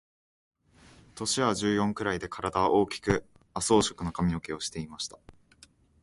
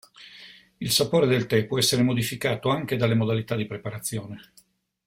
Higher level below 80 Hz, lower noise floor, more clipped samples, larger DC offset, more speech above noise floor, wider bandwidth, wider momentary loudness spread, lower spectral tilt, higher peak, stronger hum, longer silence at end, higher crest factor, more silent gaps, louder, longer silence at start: first, -52 dBFS vs -58 dBFS; first, -60 dBFS vs -49 dBFS; neither; neither; first, 31 dB vs 25 dB; second, 11.5 kHz vs 16.5 kHz; second, 11 LU vs 20 LU; about the same, -4.5 dB/octave vs -4.5 dB/octave; about the same, -8 dBFS vs -6 dBFS; neither; about the same, 0.7 s vs 0.65 s; about the same, 22 dB vs 18 dB; neither; second, -29 LUFS vs -24 LUFS; first, 1.15 s vs 0.2 s